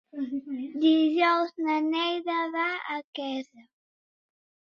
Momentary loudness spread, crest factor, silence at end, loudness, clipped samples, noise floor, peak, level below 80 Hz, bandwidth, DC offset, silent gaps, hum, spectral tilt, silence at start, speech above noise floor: 12 LU; 16 dB; 1.1 s; -27 LUFS; under 0.1%; under -90 dBFS; -12 dBFS; -80 dBFS; 6.8 kHz; under 0.1%; 3.04-3.13 s; none; -4 dB/octave; 0.15 s; over 63 dB